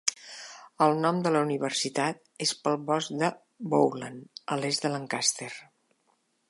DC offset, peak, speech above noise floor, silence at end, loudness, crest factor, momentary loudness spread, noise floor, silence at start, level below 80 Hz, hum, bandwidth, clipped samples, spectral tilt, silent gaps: under 0.1%; -4 dBFS; 44 dB; 0.85 s; -28 LUFS; 26 dB; 16 LU; -72 dBFS; 0.05 s; -80 dBFS; none; 11.5 kHz; under 0.1%; -3.5 dB/octave; none